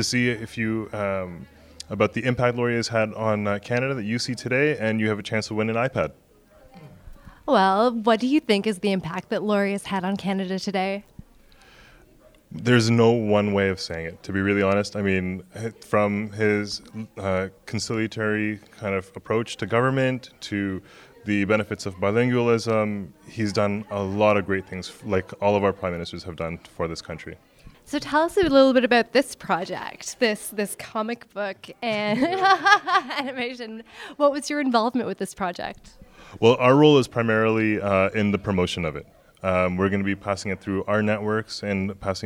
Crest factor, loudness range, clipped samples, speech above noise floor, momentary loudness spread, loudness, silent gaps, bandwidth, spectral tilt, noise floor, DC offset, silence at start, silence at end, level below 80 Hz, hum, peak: 22 dB; 5 LU; under 0.1%; 31 dB; 13 LU; -23 LUFS; none; 16 kHz; -5.5 dB/octave; -54 dBFS; under 0.1%; 0 s; 0 s; -54 dBFS; none; -2 dBFS